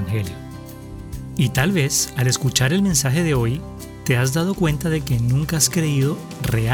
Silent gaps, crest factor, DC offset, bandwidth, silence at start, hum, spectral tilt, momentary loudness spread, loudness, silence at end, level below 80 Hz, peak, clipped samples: none; 18 dB; under 0.1%; over 20 kHz; 0 s; none; -4.5 dB/octave; 17 LU; -20 LUFS; 0 s; -38 dBFS; -2 dBFS; under 0.1%